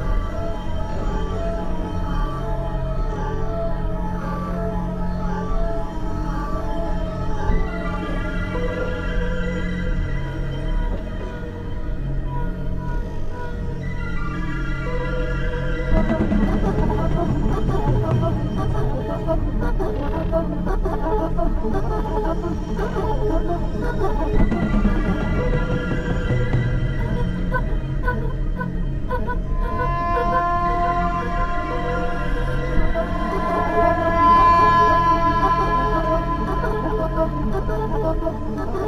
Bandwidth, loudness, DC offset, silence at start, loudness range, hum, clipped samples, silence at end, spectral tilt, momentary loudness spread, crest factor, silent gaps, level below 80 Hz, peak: 7.2 kHz; -23 LUFS; under 0.1%; 0 s; 10 LU; none; under 0.1%; 0 s; -8 dB/octave; 9 LU; 16 dB; none; -24 dBFS; -4 dBFS